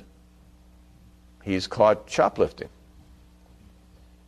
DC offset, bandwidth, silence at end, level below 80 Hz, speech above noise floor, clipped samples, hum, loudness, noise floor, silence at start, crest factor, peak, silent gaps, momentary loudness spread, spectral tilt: under 0.1%; 12.5 kHz; 1.6 s; -52 dBFS; 30 dB; under 0.1%; none; -23 LUFS; -53 dBFS; 1.45 s; 22 dB; -6 dBFS; none; 20 LU; -5 dB/octave